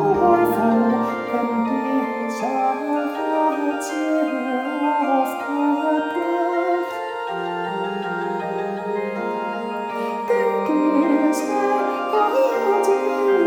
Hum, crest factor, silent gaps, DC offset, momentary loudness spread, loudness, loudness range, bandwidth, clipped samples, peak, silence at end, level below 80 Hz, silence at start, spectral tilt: none; 16 dB; none; under 0.1%; 8 LU; -21 LUFS; 5 LU; 18.5 kHz; under 0.1%; -4 dBFS; 0 s; -60 dBFS; 0 s; -5.5 dB/octave